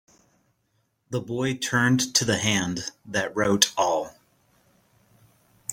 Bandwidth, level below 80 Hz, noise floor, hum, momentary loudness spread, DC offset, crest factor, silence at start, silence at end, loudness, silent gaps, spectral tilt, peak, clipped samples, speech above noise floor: 16.5 kHz; -60 dBFS; -71 dBFS; none; 13 LU; under 0.1%; 26 dB; 1.1 s; 0 s; -24 LUFS; none; -3 dB/octave; -2 dBFS; under 0.1%; 47 dB